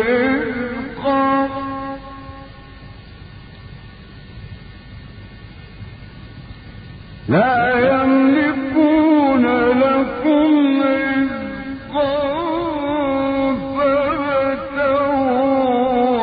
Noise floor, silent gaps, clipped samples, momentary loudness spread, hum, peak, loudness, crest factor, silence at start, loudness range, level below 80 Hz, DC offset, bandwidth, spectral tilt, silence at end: -38 dBFS; none; under 0.1%; 24 LU; none; -4 dBFS; -17 LUFS; 14 dB; 0 s; 23 LU; -42 dBFS; under 0.1%; 5 kHz; -11.5 dB/octave; 0 s